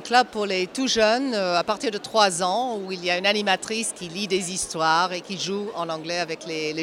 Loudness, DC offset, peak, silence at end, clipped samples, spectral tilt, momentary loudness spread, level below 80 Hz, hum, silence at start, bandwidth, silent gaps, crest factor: -23 LUFS; under 0.1%; -4 dBFS; 0 s; under 0.1%; -2.5 dB/octave; 8 LU; -62 dBFS; none; 0 s; 16 kHz; none; 20 dB